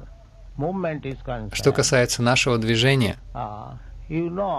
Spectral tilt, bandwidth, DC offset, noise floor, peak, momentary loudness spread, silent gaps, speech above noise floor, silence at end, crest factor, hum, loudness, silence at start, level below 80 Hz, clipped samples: -4.5 dB/octave; 14 kHz; under 0.1%; -43 dBFS; -6 dBFS; 15 LU; none; 21 dB; 0 s; 18 dB; none; -22 LUFS; 0 s; -42 dBFS; under 0.1%